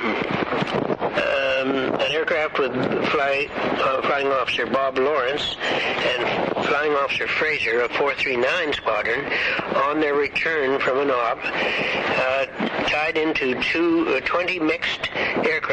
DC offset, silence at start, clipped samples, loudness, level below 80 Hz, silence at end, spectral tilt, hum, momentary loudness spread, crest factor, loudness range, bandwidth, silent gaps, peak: under 0.1%; 0 s; under 0.1%; -21 LUFS; -54 dBFS; 0 s; -4.5 dB/octave; none; 3 LU; 14 dB; 1 LU; 9.6 kHz; none; -8 dBFS